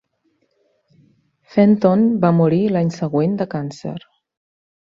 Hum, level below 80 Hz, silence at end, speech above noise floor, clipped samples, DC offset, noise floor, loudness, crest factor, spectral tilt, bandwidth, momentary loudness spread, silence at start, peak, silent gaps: none; -60 dBFS; 0.9 s; 50 dB; under 0.1%; under 0.1%; -66 dBFS; -17 LUFS; 16 dB; -9 dB/octave; 7.4 kHz; 15 LU; 1.55 s; -2 dBFS; none